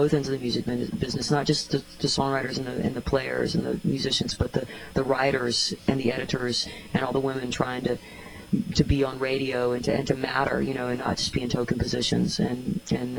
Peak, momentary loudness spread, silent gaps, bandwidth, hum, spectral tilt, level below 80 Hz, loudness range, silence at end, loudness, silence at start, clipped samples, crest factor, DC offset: -8 dBFS; 5 LU; none; over 20 kHz; none; -5 dB/octave; -44 dBFS; 1 LU; 0 s; -26 LUFS; 0 s; under 0.1%; 18 dB; under 0.1%